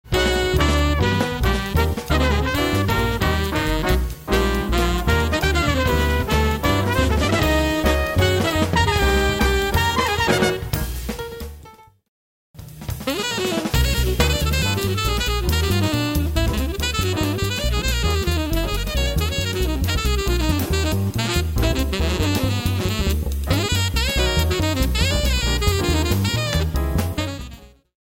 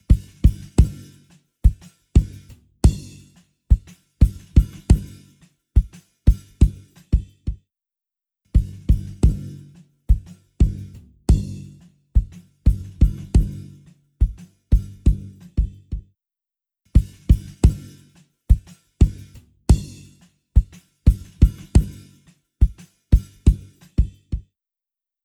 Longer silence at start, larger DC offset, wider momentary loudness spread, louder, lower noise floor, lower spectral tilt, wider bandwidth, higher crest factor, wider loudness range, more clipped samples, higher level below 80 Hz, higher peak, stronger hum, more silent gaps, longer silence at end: about the same, 0.05 s vs 0.1 s; neither; second, 4 LU vs 15 LU; about the same, -20 LUFS vs -22 LUFS; second, -45 dBFS vs -89 dBFS; second, -5 dB/octave vs -8 dB/octave; first, 16.5 kHz vs 11 kHz; about the same, 16 dB vs 20 dB; about the same, 3 LU vs 3 LU; neither; about the same, -24 dBFS vs -22 dBFS; about the same, -2 dBFS vs 0 dBFS; neither; first, 12.09-12.54 s vs none; second, 0.35 s vs 0.85 s